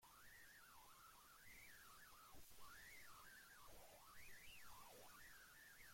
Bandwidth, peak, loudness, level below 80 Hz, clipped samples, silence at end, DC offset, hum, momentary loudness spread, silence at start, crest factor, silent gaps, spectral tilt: 16.5 kHz; -48 dBFS; -64 LUFS; -78 dBFS; under 0.1%; 0 s; under 0.1%; none; 4 LU; 0 s; 14 dB; none; -1.5 dB/octave